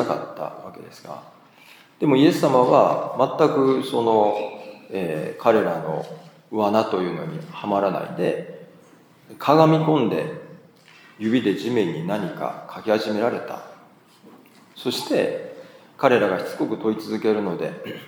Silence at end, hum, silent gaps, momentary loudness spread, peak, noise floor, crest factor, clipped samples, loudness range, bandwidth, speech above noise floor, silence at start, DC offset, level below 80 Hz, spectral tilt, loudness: 0 s; none; none; 18 LU; -2 dBFS; -51 dBFS; 22 dB; under 0.1%; 7 LU; over 20 kHz; 30 dB; 0 s; under 0.1%; -74 dBFS; -6.5 dB/octave; -22 LUFS